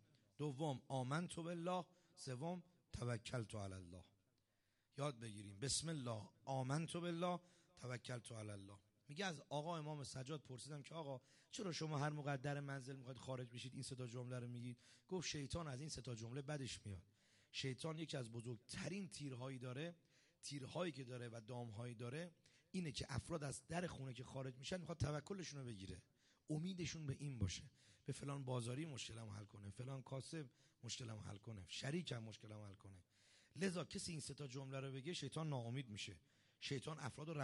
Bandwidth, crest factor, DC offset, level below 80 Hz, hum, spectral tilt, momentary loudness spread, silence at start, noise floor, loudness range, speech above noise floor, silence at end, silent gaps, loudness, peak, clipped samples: 11.5 kHz; 20 dB; under 0.1%; -72 dBFS; none; -5 dB/octave; 11 LU; 0.4 s; -85 dBFS; 4 LU; 36 dB; 0 s; none; -49 LUFS; -30 dBFS; under 0.1%